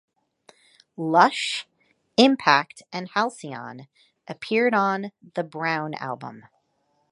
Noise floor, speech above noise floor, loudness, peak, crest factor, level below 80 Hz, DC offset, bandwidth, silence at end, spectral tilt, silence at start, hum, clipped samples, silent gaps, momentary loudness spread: -70 dBFS; 47 dB; -23 LUFS; -2 dBFS; 24 dB; -76 dBFS; under 0.1%; 11.5 kHz; 0.7 s; -4.5 dB/octave; 1 s; none; under 0.1%; none; 17 LU